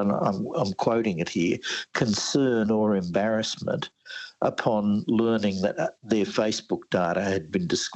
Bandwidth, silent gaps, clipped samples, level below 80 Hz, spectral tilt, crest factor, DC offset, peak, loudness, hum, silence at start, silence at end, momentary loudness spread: 8.4 kHz; none; under 0.1%; -64 dBFS; -5 dB/octave; 16 dB; under 0.1%; -10 dBFS; -26 LUFS; none; 0 s; 0 s; 6 LU